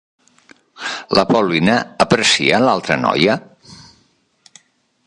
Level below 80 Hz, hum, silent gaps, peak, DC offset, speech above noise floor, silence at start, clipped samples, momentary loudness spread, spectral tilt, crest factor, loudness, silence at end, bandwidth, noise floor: -52 dBFS; none; none; 0 dBFS; under 0.1%; 44 dB; 0.8 s; under 0.1%; 12 LU; -4 dB/octave; 18 dB; -15 LUFS; 1.3 s; 11.5 kHz; -59 dBFS